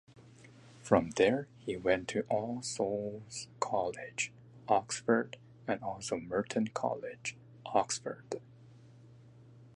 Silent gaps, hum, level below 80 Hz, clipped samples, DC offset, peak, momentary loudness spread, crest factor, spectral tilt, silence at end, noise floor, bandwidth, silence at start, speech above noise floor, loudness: none; none; -66 dBFS; under 0.1%; under 0.1%; -10 dBFS; 13 LU; 24 dB; -4.5 dB/octave; 0.1 s; -57 dBFS; 11.5 kHz; 0.15 s; 23 dB; -34 LUFS